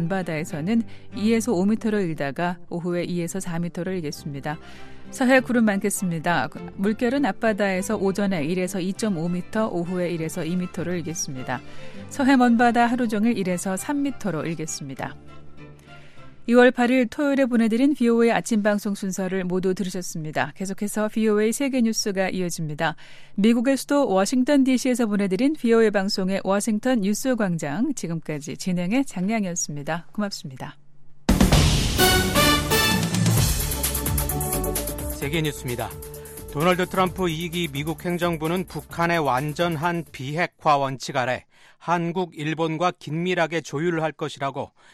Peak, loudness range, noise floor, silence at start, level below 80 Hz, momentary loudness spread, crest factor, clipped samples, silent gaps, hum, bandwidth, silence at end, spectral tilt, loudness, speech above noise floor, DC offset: -4 dBFS; 6 LU; -43 dBFS; 0 s; -38 dBFS; 11 LU; 18 dB; under 0.1%; none; none; 15.5 kHz; 0.25 s; -5 dB/octave; -23 LUFS; 20 dB; under 0.1%